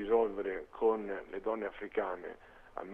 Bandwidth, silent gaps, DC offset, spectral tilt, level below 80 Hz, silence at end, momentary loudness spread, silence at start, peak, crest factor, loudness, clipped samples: 3.8 kHz; none; under 0.1%; -7 dB/octave; -62 dBFS; 0 s; 16 LU; 0 s; -18 dBFS; 18 dB; -36 LUFS; under 0.1%